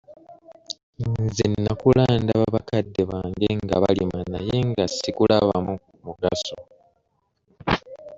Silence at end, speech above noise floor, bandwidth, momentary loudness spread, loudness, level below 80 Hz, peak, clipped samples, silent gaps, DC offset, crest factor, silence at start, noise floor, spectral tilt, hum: 0 s; 49 dB; 7.8 kHz; 14 LU; -23 LUFS; -46 dBFS; -4 dBFS; under 0.1%; 0.83-0.93 s; under 0.1%; 20 dB; 0.1 s; -71 dBFS; -6.5 dB/octave; none